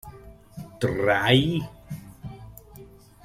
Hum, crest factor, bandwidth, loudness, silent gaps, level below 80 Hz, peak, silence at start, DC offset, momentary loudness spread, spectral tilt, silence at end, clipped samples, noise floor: none; 22 dB; 15.5 kHz; -23 LUFS; none; -50 dBFS; -6 dBFS; 0.05 s; under 0.1%; 26 LU; -6 dB/octave; 0.4 s; under 0.1%; -48 dBFS